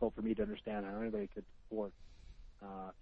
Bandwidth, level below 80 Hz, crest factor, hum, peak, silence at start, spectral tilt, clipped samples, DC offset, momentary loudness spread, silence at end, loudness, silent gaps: 6 kHz; -58 dBFS; 20 dB; none; -22 dBFS; 0 s; -8.5 dB/octave; under 0.1%; under 0.1%; 20 LU; 0 s; -42 LUFS; none